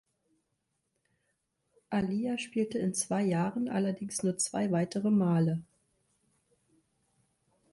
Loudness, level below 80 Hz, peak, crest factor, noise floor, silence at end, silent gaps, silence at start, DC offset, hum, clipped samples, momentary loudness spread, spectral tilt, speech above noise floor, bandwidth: -31 LUFS; -70 dBFS; -18 dBFS; 16 dB; -81 dBFS; 2.1 s; none; 1.9 s; under 0.1%; none; under 0.1%; 5 LU; -5.5 dB/octave; 51 dB; 11.5 kHz